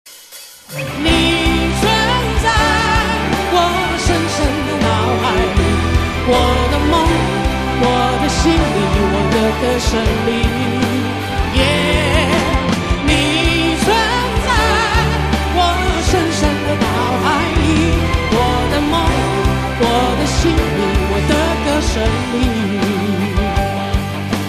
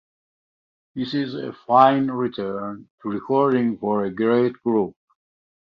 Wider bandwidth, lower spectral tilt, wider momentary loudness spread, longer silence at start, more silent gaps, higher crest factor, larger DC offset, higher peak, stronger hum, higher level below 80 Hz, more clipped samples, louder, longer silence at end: first, 14 kHz vs 6.2 kHz; second, -5 dB/octave vs -8.5 dB/octave; second, 4 LU vs 15 LU; second, 0.05 s vs 0.95 s; second, none vs 2.90-2.98 s; second, 12 dB vs 20 dB; neither; about the same, -2 dBFS vs -2 dBFS; neither; first, -22 dBFS vs -64 dBFS; neither; first, -15 LUFS vs -21 LUFS; second, 0 s vs 0.85 s